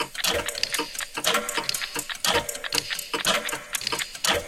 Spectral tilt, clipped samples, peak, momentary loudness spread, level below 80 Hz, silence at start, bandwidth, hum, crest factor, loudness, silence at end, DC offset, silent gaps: -0.5 dB/octave; under 0.1%; -4 dBFS; 5 LU; -52 dBFS; 0 s; 16.5 kHz; none; 22 dB; -25 LUFS; 0 s; under 0.1%; none